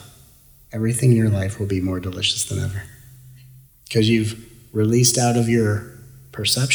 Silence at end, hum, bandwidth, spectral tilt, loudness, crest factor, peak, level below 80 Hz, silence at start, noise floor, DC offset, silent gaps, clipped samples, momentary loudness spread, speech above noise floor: 0 s; none; over 20 kHz; -4.5 dB/octave; -20 LUFS; 18 dB; -2 dBFS; -50 dBFS; 0 s; -50 dBFS; under 0.1%; none; under 0.1%; 17 LU; 31 dB